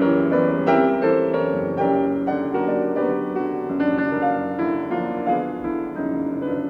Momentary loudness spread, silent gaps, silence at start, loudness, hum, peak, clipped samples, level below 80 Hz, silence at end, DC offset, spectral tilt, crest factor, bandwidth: 7 LU; none; 0 s; -22 LUFS; none; -6 dBFS; under 0.1%; -56 dBFS; 0 s; under 0.1%; -9 dB/octave; 16 dB; 5.2 kHz